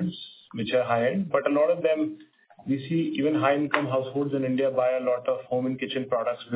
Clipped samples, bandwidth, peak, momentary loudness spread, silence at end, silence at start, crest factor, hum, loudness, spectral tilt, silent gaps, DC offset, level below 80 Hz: under 0.1%; 4 kHz; -4 dBFS; 9 LU; 0 s; 0 s; 22 dB; none; -26 LUFS; -10.5 dB/octave; none; under 0.1%; -70 dBFS